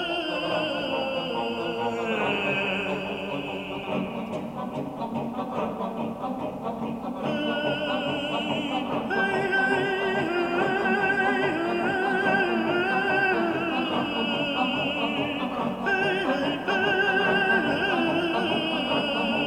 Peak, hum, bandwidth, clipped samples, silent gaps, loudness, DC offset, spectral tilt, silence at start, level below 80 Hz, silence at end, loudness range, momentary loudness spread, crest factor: -10 dBFS; none; 16 kHz; under 0.1%; none; -26 LUFS; under 0.1%; -5.5 dB/octave; 0 s; -58 dBFS; 0 s; 7 LU; 9 LU; 16 dB